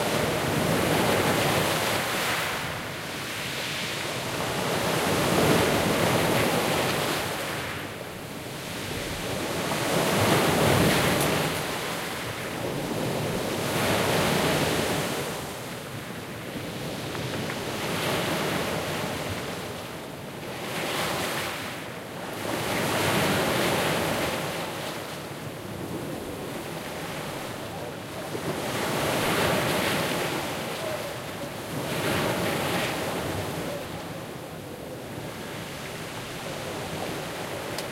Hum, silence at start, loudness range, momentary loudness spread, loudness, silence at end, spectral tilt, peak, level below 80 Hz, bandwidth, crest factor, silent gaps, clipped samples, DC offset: none; 0 s; 9 LU; 12 LU; -27 LUFS; 0 s; -4 dB/octave; -8 dBFS; -52 dBFS; 16 kHz; 20 dB; none; under 0.1%; under 0.1%